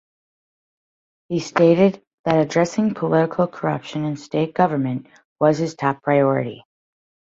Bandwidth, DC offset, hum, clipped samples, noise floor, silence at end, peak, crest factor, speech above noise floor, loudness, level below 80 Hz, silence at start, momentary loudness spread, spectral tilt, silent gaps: 7.8 kHz; under 0.1%; none; under 0.1%; under -90 dBFS; 0.8 s; -2 dBFS; 20 dB; over 71 dB; -20 LUFS; -62 dBFS; 1.3 s; 10 LU; -7 dB/octave; 2.07-2.24 s, 5.25-5.36 s